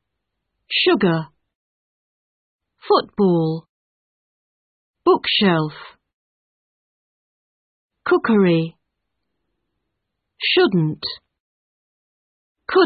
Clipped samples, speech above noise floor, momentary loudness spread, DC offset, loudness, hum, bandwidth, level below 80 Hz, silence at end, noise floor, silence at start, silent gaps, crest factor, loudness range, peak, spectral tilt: under 0.1%; 61 dB; 14 LU; under 0.1%; -18 LUFS; none; 4.9 kHz; -62 dBFS; 0 s; -78 dBFS; 0.7 s; 1.55-2.59 s, 3.69-4.94 s, 6.13-7.89 s, 11.40-12.55 s; 20 dB; 3 LU; -2 dBFS; -11 dB/octave